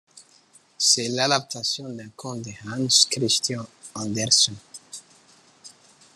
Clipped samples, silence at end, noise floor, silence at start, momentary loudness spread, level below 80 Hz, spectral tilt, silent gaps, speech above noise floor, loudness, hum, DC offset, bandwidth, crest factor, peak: under 0.1%; 0.5 s; -57 dBFS; 0.15 s; 21 LU; -70 dBFS; -2 dB/octave; none; 33 dB; -21 LUFS; none; under 0.1%; 13 kHz; 22 dB; -4 dBFS